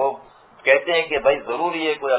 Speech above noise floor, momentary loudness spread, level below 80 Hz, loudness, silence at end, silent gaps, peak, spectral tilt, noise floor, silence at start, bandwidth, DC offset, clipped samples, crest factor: 25 dB; 7 LU; -56 dBFS; -20 LUFS; 0 s; none; -2 dBFS; -7 dB/octave; -46 dBFS; 0 s; 4 kHz; under 0.1%; under 0.1%; 20 dB